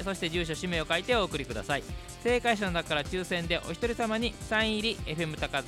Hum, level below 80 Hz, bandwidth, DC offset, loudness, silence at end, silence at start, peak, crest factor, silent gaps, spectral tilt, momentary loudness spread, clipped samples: none; -44 dBFS; 16 kHz; under 0.1%; -30 LUFS; 0 s; 0 s; -12 dBFS; 18 dB; none; -4 dB/octave; 6 LU; under 0.1%